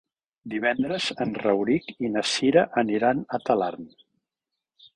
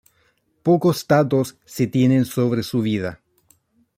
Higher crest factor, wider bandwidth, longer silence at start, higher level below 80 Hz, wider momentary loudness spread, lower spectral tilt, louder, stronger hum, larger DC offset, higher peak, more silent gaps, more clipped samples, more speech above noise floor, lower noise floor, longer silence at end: about the same, 20 dB vs 18 dB; second, 11 kHz vs 16 kHz; second, 0.45 s vs 0.65 s; second, -64 dBFS vs -58 dBFS; about the same, 7 LU vs 9 LU; second, -4.5 dB/octave vs -7 dB/octave; second, -24 LUFS vs -20 LUFS; neither; neither; about the same, -6 dBFS vs -4 dBFS; neither; neither; first, 62 dB vs 45 dB; first, -86 dBFS vs -64 dBFS; first, 1.05 s vs 0.85 s